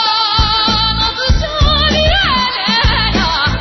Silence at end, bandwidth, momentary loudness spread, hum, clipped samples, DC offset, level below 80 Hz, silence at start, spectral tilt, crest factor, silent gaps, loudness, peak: 0 s; 6.2 kHz; 3 LU; none; under 0.1%; under 0.1%; -20 dBFS; 0 s; -4.5 dB/octave; 12 dB; none; -12 LUFS; -2 dBFS